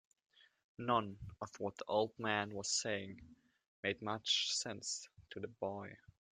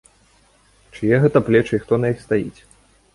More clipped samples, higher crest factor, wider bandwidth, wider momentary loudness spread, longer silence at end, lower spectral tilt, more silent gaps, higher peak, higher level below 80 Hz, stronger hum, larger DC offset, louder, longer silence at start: neither; first, 24 dB vs 18 dB; about the same, 11.5 kHz vs 11.5 kHz; first, 14 LU vs 8 LU; second, 0.35 s vs 0.65 s; second, -2.5 dB/octave vs -8 dB/octave; first, 3.68-3.83 s vs none; second, -18 dBFS vs -2 dBFS; second, -72 dBFS vs -50 dBFS; neither; neither; second, -39 LUFS vs -18 LUFS; second, 0.8 s vs 0.95 s